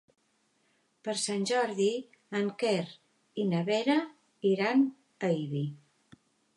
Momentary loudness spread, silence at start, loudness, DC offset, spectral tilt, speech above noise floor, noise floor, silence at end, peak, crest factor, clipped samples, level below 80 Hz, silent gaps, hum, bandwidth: 12 LU; 1.05 s; -30 LUFS; under 0.1%; -5 dB/octave; 43 dB; -72 dBFS; 0.8 s; -14 dBFS; 18 dB; under 0.1%; -84 dBFS; none; none; 11.5 kHz